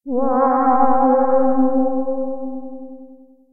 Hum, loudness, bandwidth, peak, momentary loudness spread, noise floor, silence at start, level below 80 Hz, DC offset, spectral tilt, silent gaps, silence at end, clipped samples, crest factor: none; -17 LUFS; 2.3 kHz; -4 dBFS; 18 LU; -44 dBFS; 0 s; -56 dBFS; under 0.1%; -13.5 dB/octave; none; 0 s; under 0.1%; 14 dB